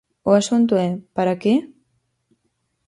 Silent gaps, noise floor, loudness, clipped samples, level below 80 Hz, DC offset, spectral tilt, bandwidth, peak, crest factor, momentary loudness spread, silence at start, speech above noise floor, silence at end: none; -71 dBFS; -19 LUFS; under 0.1%; -62 dBFS; under 0.1%; -6 dB/octave; 11.5 kHz; -4 dBFS; 18 dB; 6 LU; 0.25 s; 53 dB; 1.2 s